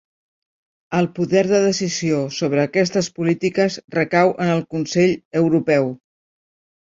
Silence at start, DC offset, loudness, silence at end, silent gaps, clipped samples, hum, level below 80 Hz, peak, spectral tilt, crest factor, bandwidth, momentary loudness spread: 0.9 s; under 0.1%; -19 LUFS; 0.9 s; 5.25-5.31 s; under 0.1%; none; -60 dBFS; -2 dBFS; -5.5 dB/octave; 18 dB; 7.8 kHz; 5 LU